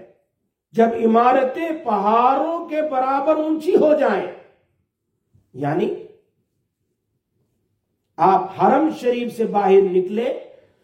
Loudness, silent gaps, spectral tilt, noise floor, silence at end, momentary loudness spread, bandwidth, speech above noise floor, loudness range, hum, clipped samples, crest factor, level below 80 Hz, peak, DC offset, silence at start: -18 LUFS; none; -7.5 dB/octave; -74 dBFS; 0.4 s; 10 LU; 14.5 kHz; 56 dB; 12 LU; none; under 0.1%; 16 dB; -68 dBFS; -2 dBFS; under 0.1%; 0 s